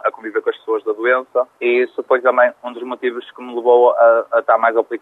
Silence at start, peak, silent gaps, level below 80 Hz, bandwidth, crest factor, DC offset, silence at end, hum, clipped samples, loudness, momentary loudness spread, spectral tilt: 0.05 s; -2 dBFS; none; -82 dBFS; 4.2 kHz; 14 dB; under 0.1%; 0.05 s; none; under 0.1%; -16 LUFS; 11 LU; -5 dB/octave